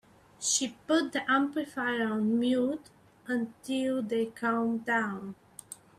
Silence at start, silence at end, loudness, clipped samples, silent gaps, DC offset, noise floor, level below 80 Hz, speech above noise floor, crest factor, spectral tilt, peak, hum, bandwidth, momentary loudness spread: 0.4 s; 0.25 s; -30 LUFS; under 0.1%; none; under 0.1%; -50 dBFS; -72 dBFS; 20 dB; 16 dB; -3 dB/octave; -14 dBFS; none; 15 kHz; 13 LU